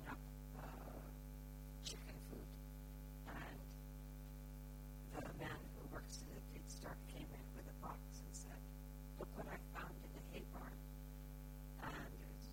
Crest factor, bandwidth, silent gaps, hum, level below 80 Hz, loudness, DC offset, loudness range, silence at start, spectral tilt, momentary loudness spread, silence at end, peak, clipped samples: 18 dB; 17 kHz; none; none; -54 dBFS; -54 LUFS; under 0.1%; 1 LU; 0 s; -5 dB/octave; 5 LU; 0 s; -34 dBFS; under 0.1%